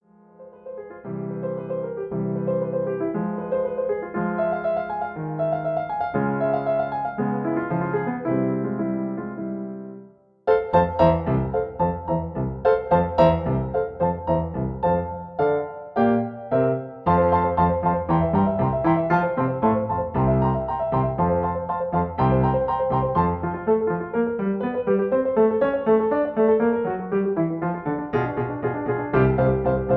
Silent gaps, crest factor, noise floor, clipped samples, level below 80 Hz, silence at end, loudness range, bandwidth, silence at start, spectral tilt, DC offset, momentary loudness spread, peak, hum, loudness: none; 18 dB; -47 dBFS; under 0.1%; -42 dBFS; 0 s; 4 LU; 5.2 kHz; 0.4 s; -11 dB/octave; under 0.1%; 9 LU; -4 dBFS; none; -23 LUFS